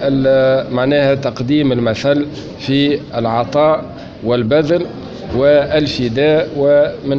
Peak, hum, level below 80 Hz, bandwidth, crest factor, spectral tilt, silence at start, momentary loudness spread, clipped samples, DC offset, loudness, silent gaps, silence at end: -2 dBFS; none; -42 dBFS; 7.4 kHz; 12 dB; -7 dB/octave; 0 s; 8 LU; under 0.1%; under 0.1%; -14 LUFS; none; 0 s